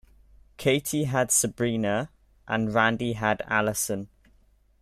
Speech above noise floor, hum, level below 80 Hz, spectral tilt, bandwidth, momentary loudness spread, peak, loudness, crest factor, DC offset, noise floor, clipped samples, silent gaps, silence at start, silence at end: 36 dB; none; -56 dBFS; -4 dB/octave; 15.5 kHz; 8 LU; -8 dBFS; -25 LUFS; 20 dB; under 0.1%; -61 dBFS; under 0.1%; none; 0.6 s; 0.75 s